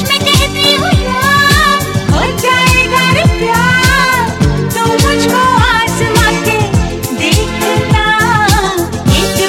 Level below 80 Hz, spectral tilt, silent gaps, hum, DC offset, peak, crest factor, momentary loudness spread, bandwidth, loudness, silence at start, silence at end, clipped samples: -22 dBFS; -4 dB/octave; none; none; under 0.1%; 0 dBFS; 10 dB; 5 LU; 17 kHz; -10 LUFS; 0 s; 0 s; under 0.1%